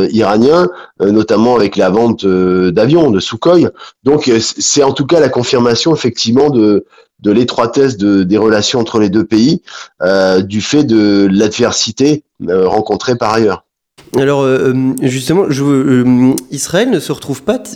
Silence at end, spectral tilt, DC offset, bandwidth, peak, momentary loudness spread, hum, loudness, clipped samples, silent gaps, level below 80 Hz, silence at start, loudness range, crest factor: 0 s; -5 dB/octave; under 0.1%; 16.5 kHz; 0 dBFS; 7 LU; none; -11 LUFS; under 0.1%; none; -46 dBFS; 0 s; 2 LU; 10 dB